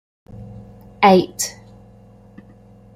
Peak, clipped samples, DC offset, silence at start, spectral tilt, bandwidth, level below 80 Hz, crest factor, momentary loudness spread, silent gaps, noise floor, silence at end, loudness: -2 dBFS; under 0.1%; under 0.1%; 0.35 s; -4.5 dB/octave; 16 kHz; -52 dBFS; 20 dB; 27 LU; none; -46 dBFS; 1.45 s; -16 LUFS